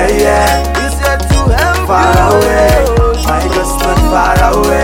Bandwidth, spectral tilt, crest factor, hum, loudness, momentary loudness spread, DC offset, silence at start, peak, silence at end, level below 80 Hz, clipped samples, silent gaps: 17 kHz; -5 dB/octave; 10 dB; none; -10 LUFS; 5 LU; under 0.1%; 0 s; 0 dBFS; 0 s; -16 dBFS; under 0.1%; none